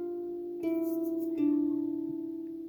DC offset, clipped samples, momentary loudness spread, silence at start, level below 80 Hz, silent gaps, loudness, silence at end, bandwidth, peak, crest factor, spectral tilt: under 0.1%; under 0.1%; 9 LU; 0 s; -72 dBFS; none; -33 LUFS; 0 s; over 20 kHz; -20 dBFS; 12 dB; -8 dB/octave